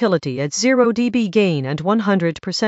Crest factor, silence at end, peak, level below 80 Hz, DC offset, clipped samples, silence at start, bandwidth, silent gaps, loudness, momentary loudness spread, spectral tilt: 14 dB; 0 s; -4 dBFS; -58 dBFS; under 0.1%; under 0.1%; 0 s; 8.2 kHz; none; -18 LUFS; 6 LU; -5 dB/octave